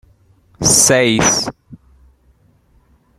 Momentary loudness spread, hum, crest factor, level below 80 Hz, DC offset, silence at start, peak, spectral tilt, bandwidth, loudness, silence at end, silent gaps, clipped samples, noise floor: 9 LU; none; 18 dB; -42 dBFS; under 0.1%; 0.6 s; 0 dBFS; -2.5 dB/octave; 16.5 kHz; -12 LUFS; 1.45 s; none; under 0.1%; -54 dBFS